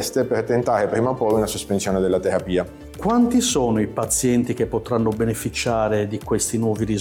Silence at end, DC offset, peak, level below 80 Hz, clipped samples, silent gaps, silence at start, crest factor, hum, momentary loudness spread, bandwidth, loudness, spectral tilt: 0 s; under 0.1%; -8 dBFS; -42 dBFS; under 0.1%; none; 0 s; 12 dB; none; 5 LU; 18 kHz; -21 LUFS; -5 dB/octave